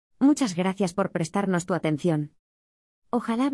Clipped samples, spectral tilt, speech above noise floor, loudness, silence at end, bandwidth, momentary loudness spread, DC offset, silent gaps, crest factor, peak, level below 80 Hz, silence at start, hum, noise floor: under 0.1%; -6 dB/octave; over 65 dB; -26 LUFS; 0 s; 12 kHz; 8 LU; under 0.1%; 2.39-3.02 s; 16 dB; -10 dBFS; -66 dBFS; 0.2 s; none; under -90 dBFS